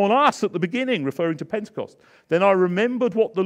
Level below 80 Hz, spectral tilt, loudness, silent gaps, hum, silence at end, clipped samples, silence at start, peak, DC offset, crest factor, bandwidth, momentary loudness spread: -72 dBFS; -6 dB/octave; -21 LUFS; none; none; 0 s; under 0.1%; 0 s; -4 dBFS; under 0.1%; 16 dB; 14 kHz; 11 LU